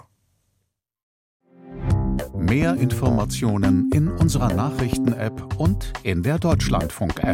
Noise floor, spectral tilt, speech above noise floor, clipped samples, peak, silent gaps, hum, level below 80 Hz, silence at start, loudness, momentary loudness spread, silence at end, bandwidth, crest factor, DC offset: -74 dBFS; -6.5 dB/octave; 53 dB; under 0.1%; -6 dBFS; none; none; -32 dBFS; 1.65 s; -22 LUFS; 7 LU; 0 s; 16.5 kHz; 16 dB; under 0.1%